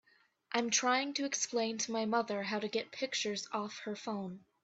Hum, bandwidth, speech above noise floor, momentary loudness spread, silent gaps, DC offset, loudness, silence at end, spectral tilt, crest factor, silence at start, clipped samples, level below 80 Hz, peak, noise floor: none; 8.4 kHz; 25 dB; 10 LU; none; under 0.1%; -35 LUFS; 0.25 s; -2 dB/octave; 20 dB; 0.5 s; under 0.1%; -82 dBFS; -16 dBFS; -61 dBFS